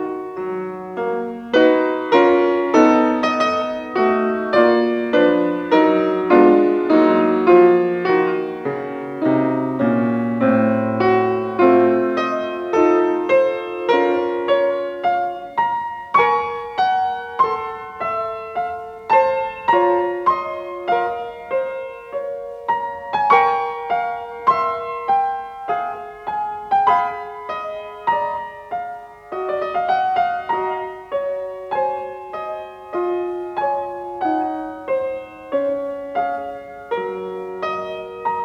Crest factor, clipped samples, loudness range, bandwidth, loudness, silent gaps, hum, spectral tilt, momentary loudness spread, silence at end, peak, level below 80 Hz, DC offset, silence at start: 18 dB; under 0.1%; 9 LU; 6.6 kHz; -19 LUFS; none; none; -6.5 dB/octave; 13 LU; 0 s; 0 dBFS; -60 dBFS; under 0.1%; 0 s